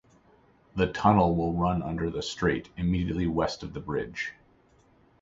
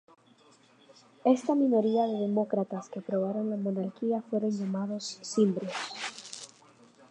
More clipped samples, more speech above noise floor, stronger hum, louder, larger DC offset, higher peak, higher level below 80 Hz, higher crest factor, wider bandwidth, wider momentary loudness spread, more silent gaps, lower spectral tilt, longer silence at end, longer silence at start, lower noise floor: neither; about the same, 34 dB vs 32 dB; neither; about the same, -28 LUFS vs -30 LUFS; neither; first, -6 dBFS vs -10 dBFS; first, -44 dBFS vs -84 dBFS; about the same, 22 dB vs 20 dB; second, 7.8 kHz vs 10.5 kHz; about the same, 12 LU vs 12 LU; neither; about the same, -6.5 dB/octave vs -6 dB/octave; first, 0.9 s vs 0.65 s; second, 0.75 s vs 1.25 s; about the same, -62 dBFS vs -61 dBFS